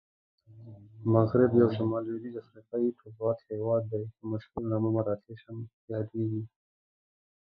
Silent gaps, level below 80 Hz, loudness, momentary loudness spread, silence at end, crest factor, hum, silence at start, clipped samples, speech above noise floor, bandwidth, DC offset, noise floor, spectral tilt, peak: 5.73-5.88 s; -62 dBFS; -30 LUFS; 20 LU; 1.1 s; 22 dB; none; 0.5 s; under 0.1%; 20 dB; 5 kHz; under 0.1%; -50 dBFS; -12 dB/octave; -8 dBFS